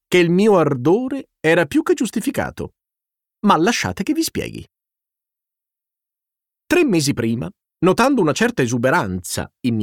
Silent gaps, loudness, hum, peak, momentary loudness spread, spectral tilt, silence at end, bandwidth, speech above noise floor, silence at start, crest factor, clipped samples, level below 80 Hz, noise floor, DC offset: none; -18 LUFS; none; -2 dBFS; 12 LU; -5 dB/octave; 0 s; 17.5 kHz; 69 dB; 0.1 s; 16 dB; under 0.1%; -50 dBFS; -86 dBFS; under 0.1%